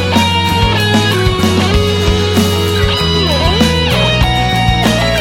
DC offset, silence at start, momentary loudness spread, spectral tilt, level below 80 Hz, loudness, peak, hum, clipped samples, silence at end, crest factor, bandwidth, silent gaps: under 0.1%; 0 s; 1 LU; -5 dB/octave; -22 dBFS; -11 LUFS; 0 dBFS; none; under 0.1%; 0 s; 12 dB; 17 kHz; none